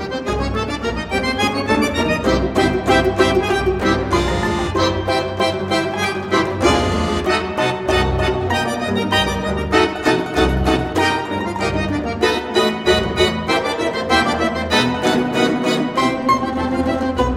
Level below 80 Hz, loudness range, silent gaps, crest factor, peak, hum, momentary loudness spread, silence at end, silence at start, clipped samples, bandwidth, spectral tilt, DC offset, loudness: -30 dBFS; 1 LU; none; 16 dB; 0 dBFS; none; 5 LU; 0 s; 0 s; under 0.1%; 16 kHz; -5 dB/octave; under 0.1%; -18 LUFS